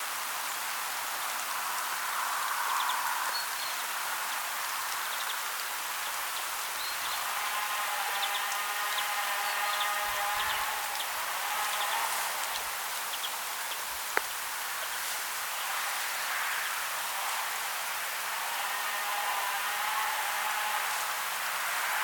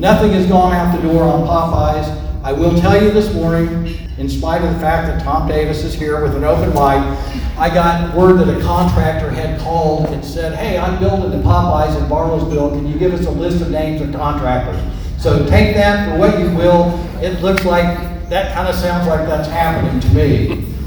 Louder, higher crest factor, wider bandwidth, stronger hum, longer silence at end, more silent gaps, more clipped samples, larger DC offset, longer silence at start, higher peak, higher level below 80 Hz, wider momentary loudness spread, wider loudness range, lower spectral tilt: second, -31 LUFS vs -15 LUFS; first, 28 dB vs 14 dB; second, 18 kHz vs over 20 kHz; neither; about the same, 0 s vs 0 s; neither; neither; neither; about the same, 0 s vs 0 s; second, -4 dBFS vs 0 dBFS; second, -72 dBFS vs -22 dBFS; second, 3 LU vs 8 LU; about the same, 2 LU vs 3 LU; second, 2 dB/octave vs -7.5 dB/octave